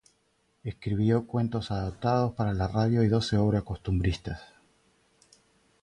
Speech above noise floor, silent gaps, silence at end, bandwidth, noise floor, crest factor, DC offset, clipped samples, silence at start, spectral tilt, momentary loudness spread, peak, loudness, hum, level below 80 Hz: 44 dB; none; 1.4 s; 10.5 kHz; -71 dBFS; 16 dB; under 0.1%; under 0.1%; 0.65 s; -7.5 dB/octave; 12 LU; -12 dBFS; -28 LUFS; none; -44 dBFS